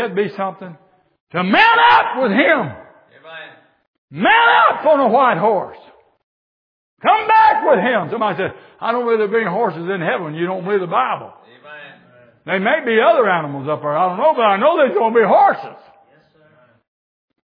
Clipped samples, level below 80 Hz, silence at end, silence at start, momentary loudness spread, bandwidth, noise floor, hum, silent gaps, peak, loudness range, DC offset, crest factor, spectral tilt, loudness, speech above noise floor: under 0.1%; -66 dBFS; 1.7 s; 0 s; 15 LU; 5.4 kHz; -53 dBFS; none; 1.20-1.27 s, 3.87-4.08 s, 6.23-6.97 s; 0 dBFS; 5 LU; under 0.1%; 16 dB; -7.5 dB/octave; -15 LUFS; 37 dB